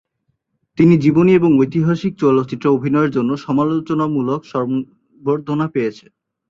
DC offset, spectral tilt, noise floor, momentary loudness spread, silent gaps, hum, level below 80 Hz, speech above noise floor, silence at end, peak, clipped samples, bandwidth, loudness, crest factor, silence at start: under 0.1%; -9 dB/octave; -70 dBFS; 10 LU; none; none; -54 dBFS; 54 dB; 0.55 s; -2 dBFS; under 0.1%; 7.4 kHz; -16 LUFS; 16 dB; 0.75 s